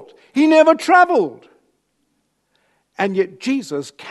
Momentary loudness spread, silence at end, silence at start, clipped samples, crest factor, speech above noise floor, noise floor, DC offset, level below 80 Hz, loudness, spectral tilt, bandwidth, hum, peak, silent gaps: 14 LU; 0 s; 0.35 s; under 0.1%; 18 dB; 52 dB; -68 dBFS; under 0.1%; -74 dBFS; -16 LUFS; -5 dB/octave; 12 kHz; 50 Hz at -70 dBFS; 0 dBFS; none